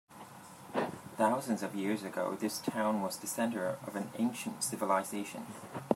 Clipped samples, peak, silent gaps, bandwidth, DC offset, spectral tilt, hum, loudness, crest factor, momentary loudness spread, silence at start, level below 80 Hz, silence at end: under 0.1%; -10 dBFS; none; 16 kHz; under 0.1%; -4.5 dB/octave; none; -35 LUFS; 24 dB; 13 LU; 0.1 s; -82 dBFS; 0 s